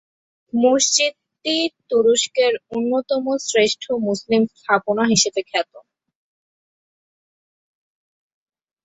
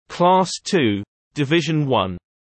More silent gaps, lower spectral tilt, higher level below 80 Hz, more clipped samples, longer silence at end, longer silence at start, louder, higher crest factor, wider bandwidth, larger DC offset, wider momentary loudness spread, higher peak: second, none vs 1.08-1.31 s; second, -2.5 dB/octave vs -5.5 dB/octave; second, -64 dBFS vs -58 dBFS; neither; first, 3.05 s vs 0.35 s; first, 0.55 s vs 0.1 s; about the same, -19 LUFS vs -19 LUFS; about the same, 20 dB vs 16 dB; about the same, 8.4 kHz vs 8.8 kHz; neither; second, 7 LU vs 11 LU; about the same, -2 dBFS vs -4 dBFS